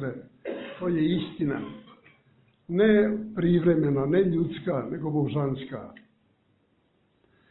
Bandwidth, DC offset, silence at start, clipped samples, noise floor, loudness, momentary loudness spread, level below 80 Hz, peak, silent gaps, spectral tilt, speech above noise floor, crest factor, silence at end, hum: 4.1 kHz; under 0.1%; 0 s; under 0.1%; -68 dBFS; -26 LUFS; 17 LU; -56 dBFS; -10 dBFS; none; -11.5 dB/octave; 43 dB; 18 dB; 1.6 s; none